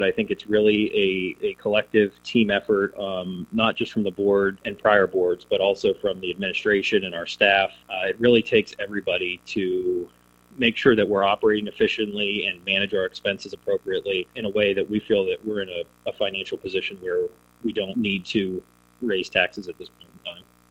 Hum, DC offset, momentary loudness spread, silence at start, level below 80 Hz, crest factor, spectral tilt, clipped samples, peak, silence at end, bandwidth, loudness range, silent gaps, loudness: none; under 0.1%; 11 LU; 0 s; -58 dBFS; 22 dB; -5.5 dB/octave; under 0.1%; -2 dBFS; 0.3 s; 8.8 kHz; 5 LU; none; -23 LUFS